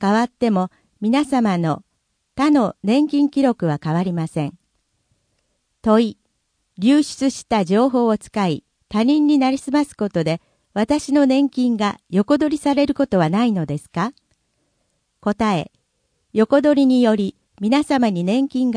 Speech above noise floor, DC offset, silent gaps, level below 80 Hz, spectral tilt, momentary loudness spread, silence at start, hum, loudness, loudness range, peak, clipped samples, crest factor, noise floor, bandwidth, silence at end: 53 dB; under 0.1%; none; -54 dBFS; -6.5 dB/octave; 10 LU; 0 s; none; -19 LUFS; 4 LU; -2 dBFS; under 0.1%; 16 dB; -70 dBFS; 10.5 kHz; 0 s